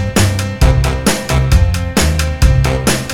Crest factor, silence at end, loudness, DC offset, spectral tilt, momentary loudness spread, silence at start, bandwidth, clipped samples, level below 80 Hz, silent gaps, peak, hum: 12 dB; 0 s; -13 LUFS; under 0.1%; -5 dB/octave; 3 LU; 0 s; 17 kHz; under 0.1%; -16 dBFS; none; 0 dBFS; none